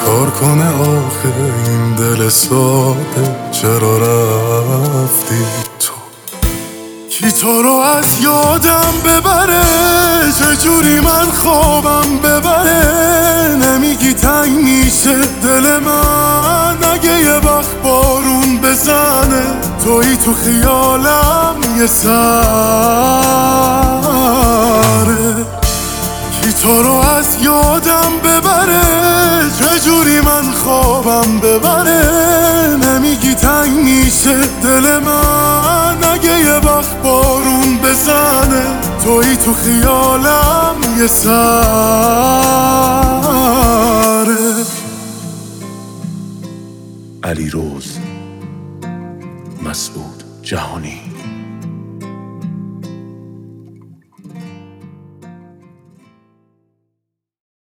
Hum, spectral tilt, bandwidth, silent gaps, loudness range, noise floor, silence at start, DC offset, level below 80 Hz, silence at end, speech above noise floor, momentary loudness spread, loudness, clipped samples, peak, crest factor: none; -4 dB/octave; over 20 kHz; none; 15 LU; -76 dBFS; 0 s; under 0.1%; -24 dBFS; 2.3 s; 66 dB; 17 LU; -10 LUFS; under 0.1%; 0 dBFS; 12 dB